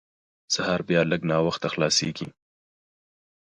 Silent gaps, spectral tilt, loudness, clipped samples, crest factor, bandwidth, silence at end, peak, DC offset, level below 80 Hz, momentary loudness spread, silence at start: none; -4 dB/octave; -24 LUFS; under 0.1%; 20 dB; 11 kHz; 1.3 s; -8 dBFS; under 0.1%; -58 dBFS; 10 LU; 0.5 s